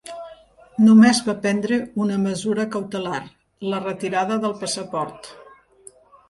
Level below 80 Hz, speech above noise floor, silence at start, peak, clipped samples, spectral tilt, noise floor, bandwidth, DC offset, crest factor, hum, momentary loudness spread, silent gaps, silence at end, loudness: -62 dBFS; 30 dB; 0.05 s; -2 dBFS; under 0.1%; -5 dB/octave; -49 dBFS; 11.5 kHz; under 0.1%; 18 dB; none; 20 LU; none; 0.9 s; -20 LUFS